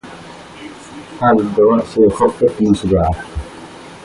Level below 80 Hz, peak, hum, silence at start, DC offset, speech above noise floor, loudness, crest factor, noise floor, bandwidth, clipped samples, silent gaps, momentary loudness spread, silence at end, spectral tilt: -34 dBFS; 0 dBFS; none; 0.05 s; under 0.1%; 21 dB; -14 LUFS; 16 dB; -35 dBFS; 11.5 kHz; under 0.1%; none; 21 LU; 0.05 s; -7.5 dB/octave